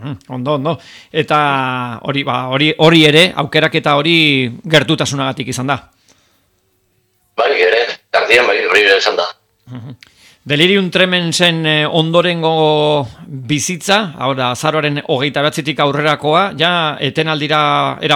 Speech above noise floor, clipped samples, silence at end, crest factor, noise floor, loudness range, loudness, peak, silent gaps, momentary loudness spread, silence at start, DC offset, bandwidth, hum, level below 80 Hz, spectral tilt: 47 dB; under 0.1%; 0 s; 14 dB; -60 dBFS; 4 LU; -13 LUFS; 0 dBFS; none; 10 LU; 0 s; under 0.1%; 20 kHz; none; -54 dBFS; -4.5 dB/octave